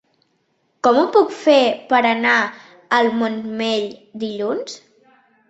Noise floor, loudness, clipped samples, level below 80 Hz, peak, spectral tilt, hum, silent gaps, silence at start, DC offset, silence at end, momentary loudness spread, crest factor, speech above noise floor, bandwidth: -66 dBFS; -18 LUFS; under 0.1%; -66 dBFS; -2 dBFS; -4 dB/octave; none; none; 0.85 s; under 0.1%; 0.7 s; 13 LU; 18 dB; 48 dB; 8.2 kHz